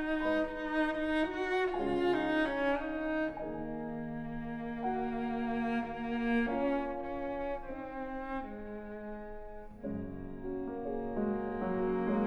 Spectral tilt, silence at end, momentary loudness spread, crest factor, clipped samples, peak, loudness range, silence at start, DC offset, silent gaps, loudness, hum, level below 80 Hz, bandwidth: -7 dB/octave; 0 s; 12 LU; 16 dB; under 0.1%; -20 dBFS; 8 LU; 0 s; under 0.1%; none; -35 LUFS; none; -50 dBFS; 10.5 kHz